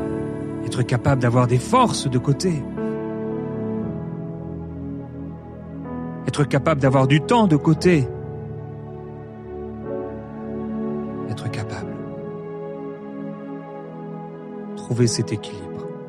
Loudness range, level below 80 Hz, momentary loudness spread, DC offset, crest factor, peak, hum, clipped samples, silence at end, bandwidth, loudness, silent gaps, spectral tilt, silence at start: 11 LU; -48 dBFS; 17 LU; under 0.1%; 18 dB; -4 dBFS; none; under 0.1%; 0 s; 12 kHz; -23 LUFS; none; -6.5 dB/octave; 0 s